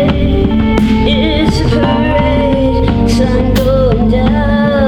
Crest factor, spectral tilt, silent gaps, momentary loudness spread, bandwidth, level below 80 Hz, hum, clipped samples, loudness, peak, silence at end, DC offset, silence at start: 8 dB; -7 dB/octave; none; 1 LU; 18 kHz; -18 dBFS; none; under 0.1%; -11 LUFS; -2 dBFS; 0 s; under 0.1%; 0 s